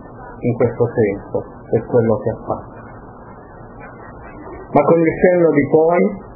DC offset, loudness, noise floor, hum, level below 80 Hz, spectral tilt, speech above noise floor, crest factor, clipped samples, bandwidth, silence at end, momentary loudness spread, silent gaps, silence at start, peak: under 0.1%; -16 LUFS; -37 dBFS; none; -44 dBFS; -14 dB/octave; 22 dB; 18 dB; under 0.1%; 2.7 kHz; 0 s; 24 LU; none; 0 s; 0 dBFS